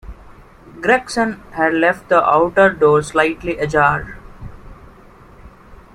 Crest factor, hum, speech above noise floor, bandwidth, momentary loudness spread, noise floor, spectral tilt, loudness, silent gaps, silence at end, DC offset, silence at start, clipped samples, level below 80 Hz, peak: 18 dB; none; 28 dB; 13 kHz; 10 LU; -43 dBFS; -5.5 dB/octave; -16 LUFS; none; 0.2 s; under 0.1%; 0.05 s; under 0.1%; -42 dBFS; 0 dBFS